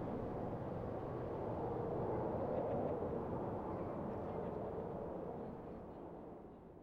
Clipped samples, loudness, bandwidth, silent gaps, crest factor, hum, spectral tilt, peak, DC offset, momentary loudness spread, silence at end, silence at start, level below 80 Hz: under 0.1%; -43 LUFS; 7 kHz; none; 14 dB; none; -10 dB/octave; -28 dBFS; under 0.1%; 11 LU; 0 s; 0 s; -60 dBFS